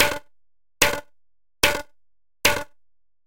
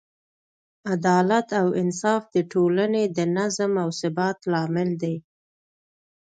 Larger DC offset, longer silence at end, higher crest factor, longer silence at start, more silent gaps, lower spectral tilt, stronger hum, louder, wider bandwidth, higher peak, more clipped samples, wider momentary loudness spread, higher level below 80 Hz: neither; second, 0.55 s vs 1.15 s; first, 26 dB vs 16 dB; second, 0 s vs 0.85 s; neither; second, -1 dB/octave vs -6 dB/octave; neither; about the same, -22 LUFS vs -23 LUFS; first, 17 kHz vs 9.2 kHz; first, 0 dBFS vs -8 dBFS; neither; first, 13 LU vs 7 LU; first, -46 dBFS vs -70 dBFS